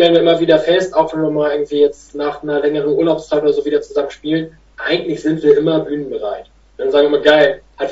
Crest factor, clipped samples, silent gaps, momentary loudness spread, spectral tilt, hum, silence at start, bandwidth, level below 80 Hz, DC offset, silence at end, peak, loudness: 14 dB; under 0.1%; none; 11 LU; -6 dB/octave; none; 0 s; 8 kHz; -50 dBFS; under 0.1%; 0 s; 0 dBFS; -15 LUFS